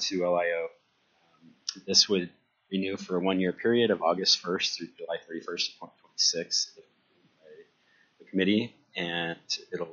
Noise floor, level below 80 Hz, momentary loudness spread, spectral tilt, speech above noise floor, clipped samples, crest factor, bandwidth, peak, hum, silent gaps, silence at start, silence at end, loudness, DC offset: -69 dBFS; -76 dBFS; 14 LU; -2.5 dB/octave; 40 dB; under 0.1%; 22 dB; 7.2 kHz; -8 dBFS; none; none; 0 s; 0 s; -28 LUFS; under 0.1%